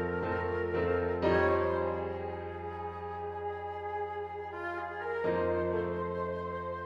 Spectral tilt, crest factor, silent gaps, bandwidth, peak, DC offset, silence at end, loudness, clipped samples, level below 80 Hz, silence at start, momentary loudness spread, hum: -8.5 dB/octave; 16 dB; none; 7 kHz; -16 dBFS; under 0.1%; 0 s; -34 LUFS; under 0.1%; -54 dBFS; 0 s; 11 LU; none